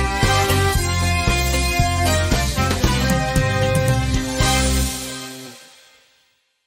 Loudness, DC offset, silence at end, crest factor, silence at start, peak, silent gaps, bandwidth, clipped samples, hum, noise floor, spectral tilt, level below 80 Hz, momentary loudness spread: -18 LUFS; under 0.1%; 1.05 s; 14 dB; 0 s; -4 dBFS; none; 16 kHz; under 0.1%; none; -63 dBFS; -4 dB/octave; -26 dBFS; 8 LU